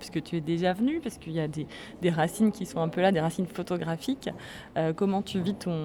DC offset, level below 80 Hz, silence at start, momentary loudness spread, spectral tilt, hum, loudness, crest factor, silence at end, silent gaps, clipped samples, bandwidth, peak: under 0.1%; -58 dBFS; 0 s; 9 LU; -6.5 dB/octave; none; -29 LUFS; 16 dB; 0 s; none; under 0.1%; 17 kHz; -12 dBFS